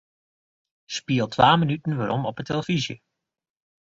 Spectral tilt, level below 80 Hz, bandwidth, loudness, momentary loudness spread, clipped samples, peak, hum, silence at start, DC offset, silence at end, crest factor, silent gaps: -5.5 dB/octave; -58 dBFS; 7.8 kHz; -23 LUFS; 15 LU; under 0.1%; -2 dBFS; none; 0.9 s; under 0.1%; 0.9 s; 24 dB; none